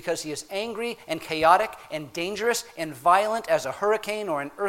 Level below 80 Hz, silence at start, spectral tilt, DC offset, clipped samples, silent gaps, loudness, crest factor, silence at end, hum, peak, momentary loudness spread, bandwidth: -62 dBFS; 0 s; -3 dB/octave; under 0.1%; under 0.1%; none; -25 LUFS; 22 dB; 0 s; none; -4 dBFS; 12 LU; 16.5 kHz